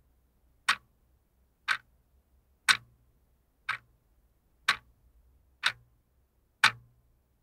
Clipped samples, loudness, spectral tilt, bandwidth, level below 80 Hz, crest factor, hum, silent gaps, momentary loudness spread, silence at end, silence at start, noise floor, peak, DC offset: under 0.1%; -30 LUFS; 1 dB/octave; 16 kHz; -68 dBFS; 30 dB; none; none; 13 LU; 0.65 s; 0.7 s; -70 dBFS; -6 dBFS; under 0.1%